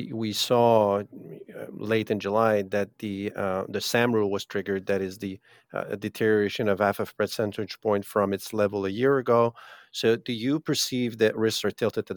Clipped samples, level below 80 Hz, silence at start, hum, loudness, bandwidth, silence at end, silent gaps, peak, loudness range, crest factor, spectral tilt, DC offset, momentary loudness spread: under 0.1%; -72 dBFS; 0 s; none; -26 LUFS; 19 kHz; 0 s; none; -6 dBFS; 2 LU; 20 dB; -5 dB/octave; under 0.1%; 12 LU